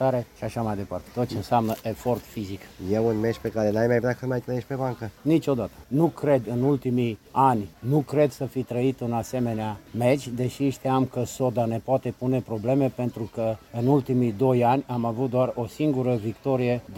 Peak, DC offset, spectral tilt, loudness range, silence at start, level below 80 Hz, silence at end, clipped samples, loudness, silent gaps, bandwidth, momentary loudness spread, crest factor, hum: -8 dBFS; under 0.1%; -7.5 dB/octave; 2 LU; 0 s; -54 dBFS; 0 s; under 0.1%; -25 LUFS; none; 17 kHz; 8 LU; 18 dB; none